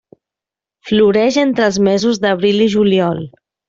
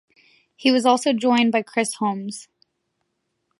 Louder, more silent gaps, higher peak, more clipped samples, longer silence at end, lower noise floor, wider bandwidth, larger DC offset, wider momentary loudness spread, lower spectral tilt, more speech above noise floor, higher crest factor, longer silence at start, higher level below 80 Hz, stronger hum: first, -13 LUFS vs -20 LUFS; neither; about the same, -2 dBFS vs -4 dBFS; neither; second, 0.4 s vs 1.15 s; first, -87 dBFS vs -75 dBFS; second, 7.6 kHz vs 11.5 kHz; neither; second, 7 LU vs 13 LU; first, -5.5 dB/octave vs -3.5 dB/octave; first, 74 dB vs 55 dB; second, 12 dB vs 20 dB; first, 0.85 s vs 0.6 s; first, -52 dBFS vs -76 dBFS; neither